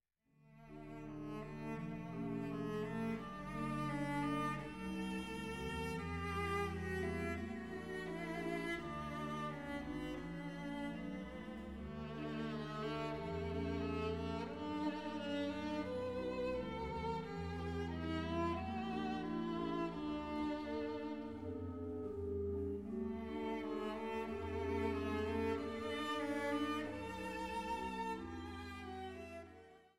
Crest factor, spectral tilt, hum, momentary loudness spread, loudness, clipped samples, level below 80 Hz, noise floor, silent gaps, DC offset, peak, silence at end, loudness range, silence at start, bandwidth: 14 dB; -6.5 dB/octave; none; 8 LU; -43 LUFS; under 0.1%; -58 dBFS; -71 dBFS; none; under 0.1%; -28 dBFS; 0 s; 4 LU; 0 s; 16 kHz